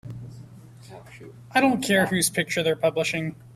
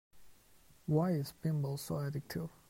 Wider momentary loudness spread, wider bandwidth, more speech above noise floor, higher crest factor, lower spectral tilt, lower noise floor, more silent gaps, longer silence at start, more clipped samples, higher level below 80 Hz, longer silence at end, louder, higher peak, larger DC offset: first, 23 LU vs 9 LU; about the same, 15.5 kHz vs 16 kHz; second, 21 dB vs 29 dB; about the same, 18 dB vs 16 dB; second, -4 dB/octave vs -7 dB/octave; second, -45 dBFS vs -65 dBFS; neither; about the same, 0.05 s vs 0.15 s; neither; first, -60 dBFS vs -66 dBFS; second, 0.05 s vs 0.2 s; first, -23 LUFS vs -37 LUFS; first, -6 dBFS vs -20 dBFS; neither